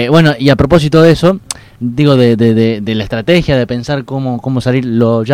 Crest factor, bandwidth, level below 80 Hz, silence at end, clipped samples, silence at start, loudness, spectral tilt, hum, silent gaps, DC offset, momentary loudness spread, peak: 10 dB; 15 kHz; -32 dBFS; 0 s; 2%; 0 s; -11 LUFS; -6.5 dB/octave; none; none; under 0.1%; 10 LU; 0 dBFS